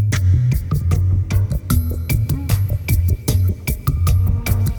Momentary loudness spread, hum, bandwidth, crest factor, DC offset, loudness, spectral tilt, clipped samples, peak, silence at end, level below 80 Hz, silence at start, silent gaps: 4 LU; none; over 20 kHz; 14 dB; under 0.1%; -18 LUFS; -6 dB/octave; under 0.1%; -2 dBFS; 0 s; -24 dBFS; 0 s; none